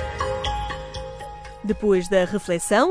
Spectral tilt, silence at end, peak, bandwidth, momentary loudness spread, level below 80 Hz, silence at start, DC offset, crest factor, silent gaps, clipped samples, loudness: -4.5 dB/octave; 0 s; -6 dBFS; 11 kHz; 15 LU; -38 dBFS; 0 s; under 0.1%; 18 dB; none; under 0.1%; -23 LUFS